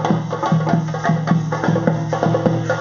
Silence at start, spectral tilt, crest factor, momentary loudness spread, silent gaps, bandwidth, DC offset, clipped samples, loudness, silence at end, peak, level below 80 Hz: 0 s; -7 dB/octave; 18 dB; 2 LU; none; 7.2 kHz; under 0.1%; under 0.1%; -18 LUFS; 0 s; 0 dBFS; -50 dBFS